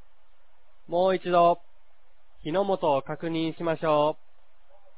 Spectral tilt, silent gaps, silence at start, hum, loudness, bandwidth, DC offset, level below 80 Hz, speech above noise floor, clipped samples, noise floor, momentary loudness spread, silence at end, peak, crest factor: -10 dB/octave; none; 0.9 s; none; -26 LUFS; 4 kHz; 0.9%; -64 dBFS; 39 dB; under 0.1%; -64 dBFS; 10 LU; 0.85 s; -10 dBFS; 18 dB